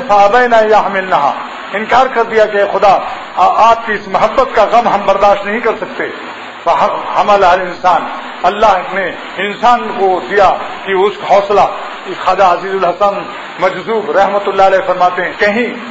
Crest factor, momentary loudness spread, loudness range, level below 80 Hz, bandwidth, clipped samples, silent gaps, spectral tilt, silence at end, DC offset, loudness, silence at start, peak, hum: 12 dB; 10 LU; 2 LU; -42 dBFS; 8 kHz; under 0.1%; none; -4.5 dB/octave; 0 s; under 0.1%; -11 LUFS; 0 s; 0 dBFS; none